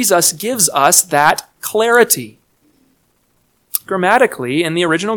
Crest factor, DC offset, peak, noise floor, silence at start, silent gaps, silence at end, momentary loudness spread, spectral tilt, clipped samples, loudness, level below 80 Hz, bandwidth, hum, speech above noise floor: 16 dB; under 0.1%; 0 dBFS; -60 dBFS; 0 s; none; 0 s; 11 LU; -2.5 dB/octave; 0.2%; -13 LUFS; -58 dBFS; over 20 kHz; none; 46 dB